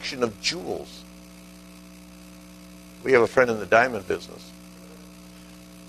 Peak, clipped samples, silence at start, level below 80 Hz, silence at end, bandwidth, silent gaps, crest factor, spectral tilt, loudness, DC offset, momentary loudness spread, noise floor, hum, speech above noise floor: -4 dBFS; under 0.1%; 0 s; -56 dBFS; 0.05 s; 13.5 kHz; none; 24 dB; -4 dB/octave; -23 LUFS; under 0.1%; 26 LU; -46 dBFS; 60 Hz at -50 dBFS; 22 dB